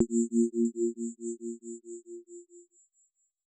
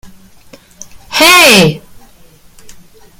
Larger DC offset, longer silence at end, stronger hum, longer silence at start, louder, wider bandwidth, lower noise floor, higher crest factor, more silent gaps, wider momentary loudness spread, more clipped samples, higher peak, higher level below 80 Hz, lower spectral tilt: neither; second, 0.85 s vs 1.4 s; neither; about the same, 0 s vs 0.05 s; second, -31 LUFS vs -5 LUFS; second, 9 kHz vs over 20 kHz; first, -72 dBFS vs -41 dBFS; first, 20 dB vs 12 dB; neither; first, 20 LU vs 16 LU; second, under 0.1% vs 0.8%; second, -14 dBFS vs 0 dBFS; second, under -90 dBFS vs -42 dBFS; first, -9 dB/octave vs -2.5 dB/octave